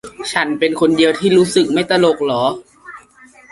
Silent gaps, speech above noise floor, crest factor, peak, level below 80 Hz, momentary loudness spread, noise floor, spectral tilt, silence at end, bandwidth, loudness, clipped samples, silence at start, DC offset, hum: none; 31 dB; 14 dB; 0 dBFS; -54 dBFS; 7 LU; -45 dBFS; -4.5 dB/octave; 0.55 s; 11.5 kHz; -15 LUFS; under 0.1%; 0.05 s; under 0.1%; none